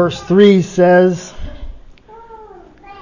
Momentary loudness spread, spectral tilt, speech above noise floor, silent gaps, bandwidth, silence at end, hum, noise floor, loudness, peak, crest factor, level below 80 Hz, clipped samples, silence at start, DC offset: 23 LU; -6.5 dB/octave; 28 dB; none; 7.4 kHz; 0.1 s; none; -39 dBFS; -11 LUFS; 0 dBFS; 14 dB; -36 dBFS; under 0.1%; 0 s; under 0.1%